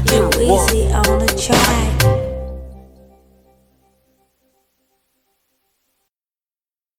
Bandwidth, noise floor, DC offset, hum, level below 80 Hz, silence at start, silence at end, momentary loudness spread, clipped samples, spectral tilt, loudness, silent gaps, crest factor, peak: 17.5 kHz; under -90 dBFS; under 0.1%; none; -26 dBFS; 0 s; 4.15 s; 16 LU; under 0.1%; -4 dB/octave; -15 LUFS; none; 18 dB; 0 dBFS